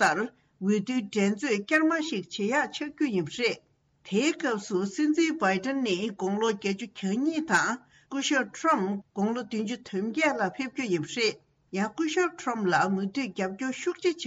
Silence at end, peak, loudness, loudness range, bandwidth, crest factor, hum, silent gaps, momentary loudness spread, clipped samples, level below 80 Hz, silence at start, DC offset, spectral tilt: 0 s; -12 dBFS; -28 LUFS; 2 LU; 8.4 kHz; 16 dB; none; none; 7 LU; under 0.1%; -72 dBFS; 0 s; under 0.1%; -4.5 dB/octave